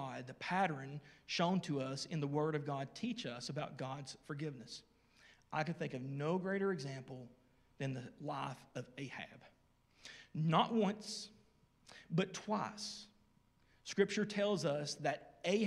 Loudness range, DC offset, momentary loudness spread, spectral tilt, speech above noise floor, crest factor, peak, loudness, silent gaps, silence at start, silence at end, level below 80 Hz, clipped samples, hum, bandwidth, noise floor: 5 LU; under 0.1%; 17 LU; -5.5 dB/octave; 33 dB; 22 dB; -20 dBFS; -40 LUFS; none; 0 s; 0 s; -78 dBFS; under 0.1%; none; 12.5 kHz; -72 dBFS